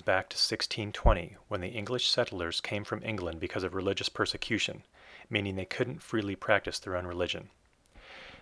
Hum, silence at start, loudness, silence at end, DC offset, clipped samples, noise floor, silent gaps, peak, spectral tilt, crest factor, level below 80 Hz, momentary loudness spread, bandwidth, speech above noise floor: none; 0.05 s; -32 LUFS; 0 s; under 0.1%; under 0.1%; -59 dBFS; none; -8 dBFS; -4 dB/octave; 26 dB; -42 dBFS; 9 LU; 11 kHz; 27 dB